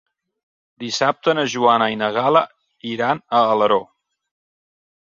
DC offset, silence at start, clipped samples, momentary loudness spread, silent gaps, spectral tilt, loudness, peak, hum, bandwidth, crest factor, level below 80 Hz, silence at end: under 0.1%; 0.8 s; under 0.1%; 13 LU; none; -4 dB/octave; -18 LUFS; -2 dBFS; none; 7.6 kHz; 18 dB; -66 dBFS; 1.2 s